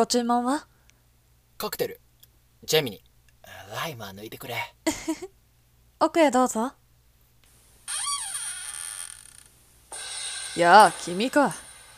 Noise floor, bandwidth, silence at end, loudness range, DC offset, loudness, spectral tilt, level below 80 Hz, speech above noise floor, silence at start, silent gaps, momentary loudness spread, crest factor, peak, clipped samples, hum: -61 dBFS; 16 kHz; 0.2 s; 10 LU; under 0.1%; -25 LUFS; -3 dB/octave; -62 dBFS; 38 dB; 0 s; none; 19 LU; 26 dB; 0 dBFS; under 0.1%; none